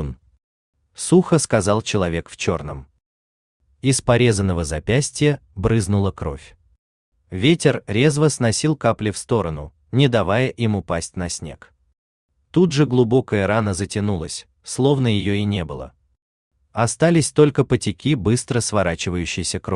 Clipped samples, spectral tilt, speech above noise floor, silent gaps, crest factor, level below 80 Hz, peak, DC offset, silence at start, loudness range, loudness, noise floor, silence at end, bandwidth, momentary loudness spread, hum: under 0.1%; -5.5 dB/octave; over 71 dB; 0.44-0.73 s, 3.06-3.60 s, 6.78-7.12 s, 11.98-12.29 s, 16.22-16.51 s; 18 dB; -44 dBFS; -2 dBFS; under 0.1%; 0 s; 3 LU; -19 LUFS; under -90 dBFS; 0 s; 12.5 kHz; 13 LU; none